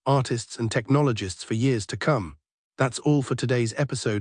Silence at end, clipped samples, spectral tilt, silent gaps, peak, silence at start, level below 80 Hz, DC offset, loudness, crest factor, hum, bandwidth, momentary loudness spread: 0 s; under 0.1%; -6 dB/octave; 2.52-2.71 s; -8 dBFS; 0.05 s; -58 dBFS; under 0.1%; -25 LUFS; 16 dB; none; 10.5 kHz; 6 LU